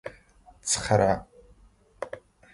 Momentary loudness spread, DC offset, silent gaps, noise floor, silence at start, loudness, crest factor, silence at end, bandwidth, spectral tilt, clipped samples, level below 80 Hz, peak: 20 LU; under 0.1%; none; -58 dBFS; 0.05 s; -25 LUFS; 22 dB; 0.35 s; 11.5 kHz; -4 dB/octave; under 0.1%; -50 dBFS; -8 dBFS